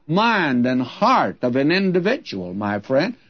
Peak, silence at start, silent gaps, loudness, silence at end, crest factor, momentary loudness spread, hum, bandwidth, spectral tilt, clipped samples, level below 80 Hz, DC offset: -4 dBFS; 0.1 s; none; -19 LUFS; 0.15 s; 14 dB; 8 LU; none; 6.6 kHz; -6.5 dB/octave; under 0.1%; -64 dBFS; 0.1%